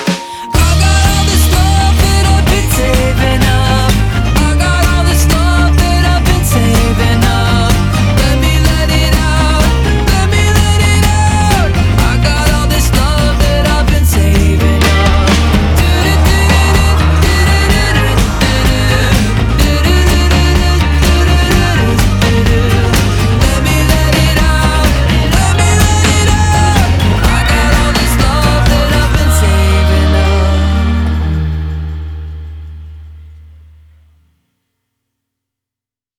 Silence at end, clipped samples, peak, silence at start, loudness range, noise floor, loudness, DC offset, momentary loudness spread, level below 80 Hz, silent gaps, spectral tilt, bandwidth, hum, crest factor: 2.8 s; under 0.1%; 0 dBFS; 0 s; 2 LU; -87 dBFS; -10 LUFS; under 0.1%; 2 LU; -12 dBFS; none; -5 dB/octave; 17.5 kHz; 60 Hz at -30 dBFS; 10 dB